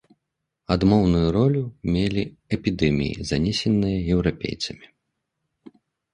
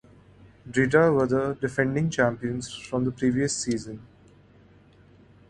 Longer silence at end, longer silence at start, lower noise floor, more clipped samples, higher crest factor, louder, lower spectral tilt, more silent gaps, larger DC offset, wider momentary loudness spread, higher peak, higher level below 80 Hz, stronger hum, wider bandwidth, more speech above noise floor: second, 1.3 s vs 1.45 s; about the same, 0.7 s vs 0.65 s; first, -80 dBFS vs -55 dBFS; neither; about the same, 20 dB vs 20 dB; about the same, -23 LUFS vs -25 LUFS; first, -7 dB/octave vs -5.5 dB/octave; neither; neither; about the same, 10 LU vs 12 LU; about the same, -4 dBFS vs -6 dBFS; first, -40 dBFS vs -54 dBFS; neither; about the same, 10.5 kHz vs 11.5 kHz; first, 59 dB vs 30 dB